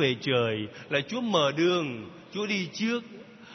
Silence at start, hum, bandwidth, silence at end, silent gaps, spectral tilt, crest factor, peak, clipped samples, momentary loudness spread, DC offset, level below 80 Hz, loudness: 0 s; none; 6.4 kHz; 0 s; none; -5 dB/octave; 18 dB; -10 dBFS; under 0.1%; 13 LU; under 0.1%; -72 dBFS; -28 LUFS